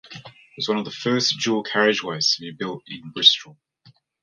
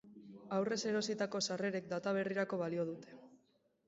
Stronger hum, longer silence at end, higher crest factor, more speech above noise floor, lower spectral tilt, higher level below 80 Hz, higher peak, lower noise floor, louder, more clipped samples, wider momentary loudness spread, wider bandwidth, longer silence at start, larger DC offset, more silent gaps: neither; first, 0.7 s vs 0.5 s; first, 24 dB vs 16 dB; second, 34 dB vs 38 dB; about the same, -3 dB/octave vs -4 dB/octave; first, -70 dBFS vs -80 dBFS; first, 0 dBFS vs -24 dBFS; second, -56 dBFS vs -75 dBFS; first, -20 LUFS vs -38 LUFS; neither; first, 19 LU vs 15 LU; first, 11.5 kHz vs 7.6 kHz; about the same, 0.05 s vs 0.05 s; neither; neither